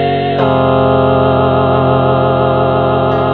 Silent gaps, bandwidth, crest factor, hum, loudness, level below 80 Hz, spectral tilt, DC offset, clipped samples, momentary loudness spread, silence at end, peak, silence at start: none; 4.5 kHz; 10 dB; none; -11 LUFS; -36 dBFS; -10 dB/octave; 1%; under 0.1%; 2 LU; 0 s; 0 dBFS; 0 s